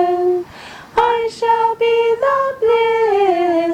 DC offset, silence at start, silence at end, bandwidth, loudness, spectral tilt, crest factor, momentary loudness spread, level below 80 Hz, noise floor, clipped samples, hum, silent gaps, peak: under 0.1%; 0 s; 0 s; 9.8 kHz; -16 LUFS; -5 dB/octave; 12 dB; 6 LU; -52 dBFS; -36 dBFS; under 0.1%; none; none; -2 dBFS